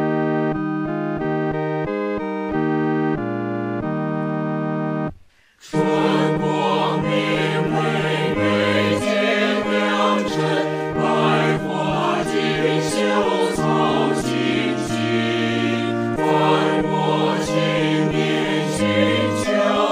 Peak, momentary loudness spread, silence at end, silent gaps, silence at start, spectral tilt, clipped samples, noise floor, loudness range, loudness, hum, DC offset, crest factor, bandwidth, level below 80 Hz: -4 dBFS; 6 LU; 0 s; none; 0 s; -5.5 dB/octave; under 0.1%; -50 dBFS; 4 LU; -20 LUFS; none; under 0.1%; 14 dB; 15.5 kHz; -50 dBFS